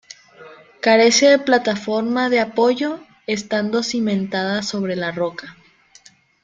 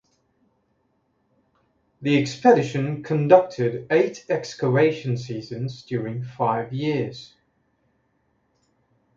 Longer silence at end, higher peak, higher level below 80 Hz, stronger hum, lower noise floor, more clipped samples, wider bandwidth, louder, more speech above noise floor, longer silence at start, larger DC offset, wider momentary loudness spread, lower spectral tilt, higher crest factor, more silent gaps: second, 0.9 s vs 1.9 s; about the same, -2 dBFS vs 0 dBFS; about the same, -62 dBFS vs -64 dBFS; neither; second, -51 dBFS vs -69 dBFS; neither; first, 9.4 kHz vs 7.6 kHz; first, -18 LUFS vs -22 LUFS; second, 33 dB vs 47 dB; second, 0.4 s vs 2 s; neither; about the same, 13 LU vs 14 LU; second, -3.5 dB/octave vs -7 dB/octave; second, 18 dB vs 24 dB; neither